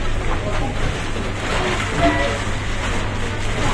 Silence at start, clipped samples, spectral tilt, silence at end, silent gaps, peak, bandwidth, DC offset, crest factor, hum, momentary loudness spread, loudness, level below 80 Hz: 0 s; under 0.1%; -5 dB/octave; 0 s; none; -4 dBFS; 11 kHz; under 0.1%; 16 dB; none; 6 LU; -22 LUFS; -24 dBFS